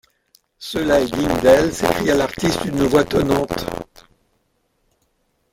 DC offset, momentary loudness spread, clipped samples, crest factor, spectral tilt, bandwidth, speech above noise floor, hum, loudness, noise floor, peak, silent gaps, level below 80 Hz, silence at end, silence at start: under 0.1%; 13 LU; under 0.1%; 18 dB; -5 dB/octave; 17 kHz; 49 dB; none; -18 LUFS; -66 dBFS; 0 dBFS; none; -40 dBFS; 1.7 s; 0.6 s